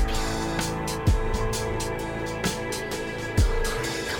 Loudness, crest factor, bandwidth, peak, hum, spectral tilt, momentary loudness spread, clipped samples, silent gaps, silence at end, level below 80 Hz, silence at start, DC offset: -27 LUFS; 14 dB; 18 kHz; -12 dBFS; none; -4.5 dB/octave; 5 LU; under 0.1%; none; 0 s; -30 dBFS; 0 s; under 0.1%